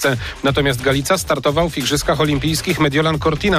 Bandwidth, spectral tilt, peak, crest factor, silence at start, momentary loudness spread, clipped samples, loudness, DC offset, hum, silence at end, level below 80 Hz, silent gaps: 15.5 kHz; -4.5 dB/octave; -6 dBFS; 12 dB; 0 s; 2 LU; under 0.1%; -17 LUFS; under 0.1%; none; 0 s; -34 dBFS; none